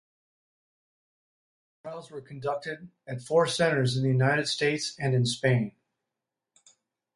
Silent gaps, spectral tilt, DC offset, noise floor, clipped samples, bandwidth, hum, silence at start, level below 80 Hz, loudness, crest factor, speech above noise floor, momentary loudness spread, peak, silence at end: none; -5 dB/octave; under 0.1%; -87 dBFS; under 0.1%; 11.5 kHz; none; 1.85 s; -66 dBFS; -27 LUFS; 20 dB; 60 dB; 17 LU; -10 dBFS; 1.45 s